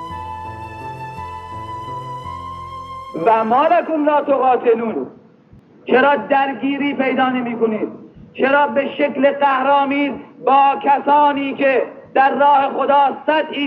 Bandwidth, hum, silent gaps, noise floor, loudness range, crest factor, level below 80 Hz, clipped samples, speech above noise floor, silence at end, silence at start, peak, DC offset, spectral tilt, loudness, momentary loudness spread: 6.2 kHz; none; none; -47 dBFS; 5 LU; 16 dB; -54 dBFS; under 0.1%; 31 dB; 0 s; 0 s; -2 dBFS; under 0.1%; -7 dB/octave; -16 LUFS; 16 LU